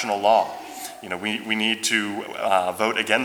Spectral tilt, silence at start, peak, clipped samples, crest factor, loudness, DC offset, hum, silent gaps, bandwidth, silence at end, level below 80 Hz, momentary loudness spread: -2.5 dB/octave; 0 s; -4 dBFS; under 0.1%; 20 dB; -22 LUFS; under 0.1%; none; none; over 20 kHz; 0 s; -70 dBFS; 13 LU